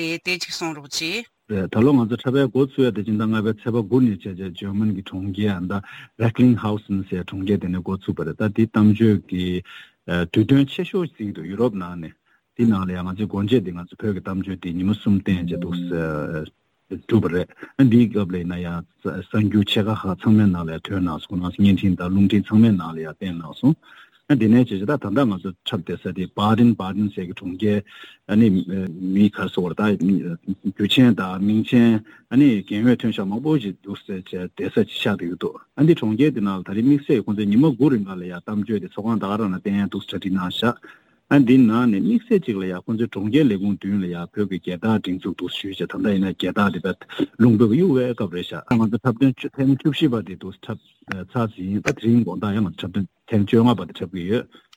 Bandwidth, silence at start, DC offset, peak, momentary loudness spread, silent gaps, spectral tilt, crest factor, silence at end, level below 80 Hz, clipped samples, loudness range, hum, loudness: 15.5 kHz; 0 s; under 0.1%; -2 dBFS; 13 LU; none; -7.5 dB/octave; 20 dB; 0.3 s; -54 dBFS; under 0.1%; 4 LU; none; -21 LUFS